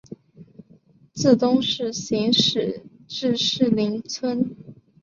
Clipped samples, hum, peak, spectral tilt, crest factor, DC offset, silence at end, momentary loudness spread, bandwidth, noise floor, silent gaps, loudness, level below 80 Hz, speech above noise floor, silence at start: under 0.1%; none; -4 dBFS; -4.5 dB/octave; 20 dB; under 0.1%; 0.3 s; 11 LU; 7.6 kHz; -54 dBFS; none; -21 LUFS; -62 dBFS; 33 dB; 0.1 s